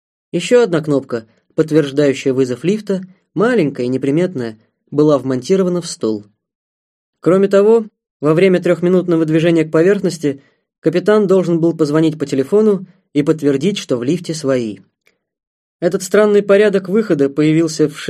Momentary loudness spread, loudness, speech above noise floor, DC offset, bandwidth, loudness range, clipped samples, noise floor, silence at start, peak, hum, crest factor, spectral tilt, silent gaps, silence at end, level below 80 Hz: 10 LU; -15 LUFS; 48 dB; under 0.1%; 13.5 kHz; 4 LU; under 0.1%; -61 dBFS; 0.35 s; 0 dBFS; none; 14 dB; -6.5 dB/octave; 6.55-7.13 s, 8.11-8.20 s, 10.78-10.82 s, 15.47-15.80 s; 0 s; -62 dBFS